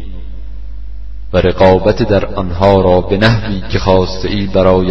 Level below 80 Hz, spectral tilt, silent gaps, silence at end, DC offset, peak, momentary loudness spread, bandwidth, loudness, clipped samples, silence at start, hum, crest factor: -26 dBFS; -7.5 dB/octave; none; 0 s; 8%; 0 dBFS; 22 LU; 7.6 kHz; -12 LUFS; 0.1%; 0 s; none; 12 dB